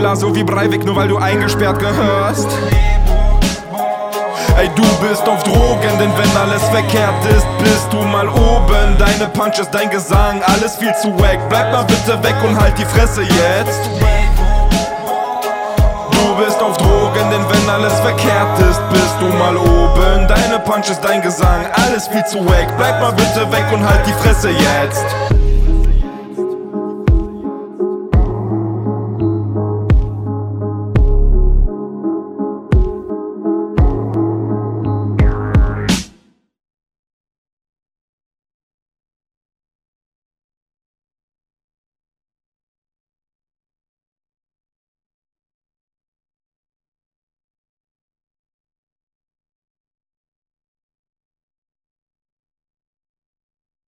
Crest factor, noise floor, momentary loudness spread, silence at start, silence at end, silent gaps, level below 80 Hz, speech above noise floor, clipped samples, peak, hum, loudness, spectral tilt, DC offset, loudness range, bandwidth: 14 dB; -51 dBFS; 8 LU; 0 s; 17.8 s; none; -18 dBFS; 39 dB; under 0.1%; 0 dBFS; none; -14 LUFS; -5.5 dB/octave; under 0.1%; 6 LU; 16.5 kHz